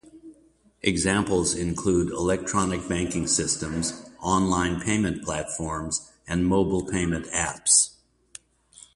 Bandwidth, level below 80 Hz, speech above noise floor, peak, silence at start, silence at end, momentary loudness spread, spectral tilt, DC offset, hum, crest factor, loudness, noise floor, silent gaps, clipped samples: 11.5 kHz; -44 dBFS; 35 dB; -4 dBFS; 0.05 s; 1.05 s; 9 LU; -3.5 dB/octave; under 0.1%; none; 20 dB; -24 LUFS; -60 dBFS; none; under 0.1%